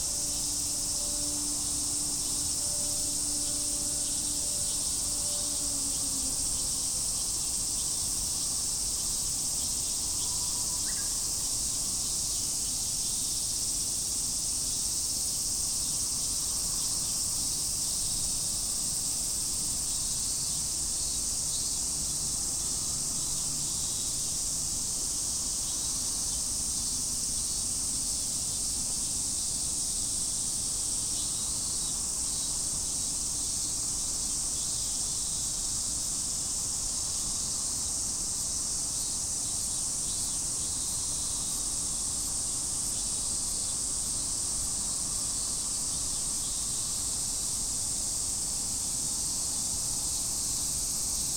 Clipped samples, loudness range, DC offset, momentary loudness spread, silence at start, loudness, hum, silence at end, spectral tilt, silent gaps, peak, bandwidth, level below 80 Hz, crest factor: under 0.1%; 1 LU; under 0.1%; 1 LU; 0 s; -28 LUFS; none; 0 s; -0.5 dB/octave; none; -16 dBFS; 18 kHz; -48 dBFS; 16 dB